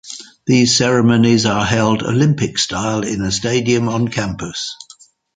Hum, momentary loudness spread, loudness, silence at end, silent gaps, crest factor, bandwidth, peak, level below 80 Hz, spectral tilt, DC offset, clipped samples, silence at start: none; 12 LU; -15 LUFS; 0.6 s; none; 16 dB; 9.6 kHz; 0 dBFS; -44 dBFS; -4.5 dB/octave; under 0.1%; under 0.1%; 0.05 s